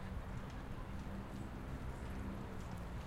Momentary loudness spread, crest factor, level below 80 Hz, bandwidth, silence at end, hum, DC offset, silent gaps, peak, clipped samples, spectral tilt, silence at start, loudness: 2 LU; 12 dB; -50 dBFS; 16 kHz; 0 s; none; under 0.1%; none; -34 dBFS; under 0.1%; -7 dB/octave; 0 s; -48 LUFS